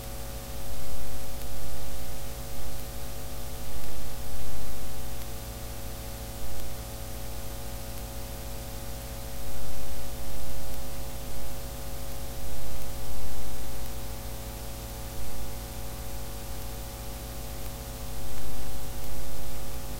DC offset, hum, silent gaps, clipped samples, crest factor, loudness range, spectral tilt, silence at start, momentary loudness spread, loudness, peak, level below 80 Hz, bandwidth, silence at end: under 0.1%; 50 Hz at -40 dBFS; none; under 0.1%; 10 dB; 0 LU; -4 dB/octave; 0 s; 0 LU; -39 LUFS; -12 dBFS; -40 dBFS; 16 kHz; 0 s